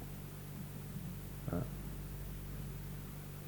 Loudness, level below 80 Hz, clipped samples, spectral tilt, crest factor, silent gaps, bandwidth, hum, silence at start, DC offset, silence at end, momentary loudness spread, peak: -45 LUFS; -52 dBFS; under 0.1%; -6.5 dB/octave; 22 dB; none; 19.5 kHz; none; 0 s; under 0.1%; 0 s; 6 LU; -22 dBFS